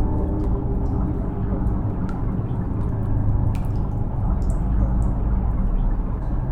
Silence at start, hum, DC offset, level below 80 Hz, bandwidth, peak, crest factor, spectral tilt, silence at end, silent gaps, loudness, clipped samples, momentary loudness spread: 0 s; none; under 0.1%; -24 dBFS; 3.1 kHz; -8 dBFS; 12 dB; -10.5 dB/octave; 0 s; none; -24 LUFS; under 0.1%; 3 LU